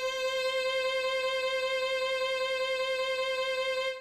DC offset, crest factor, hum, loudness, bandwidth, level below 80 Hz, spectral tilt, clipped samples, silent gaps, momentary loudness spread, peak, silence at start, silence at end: under 0.1%; 10 dB; none; -30 LUFS; 14.5 kHz; -66 dBFS; 0.5 dB/octave; under 0.1%; none; 1 LU; -20 dBFS; 0 s; 0 s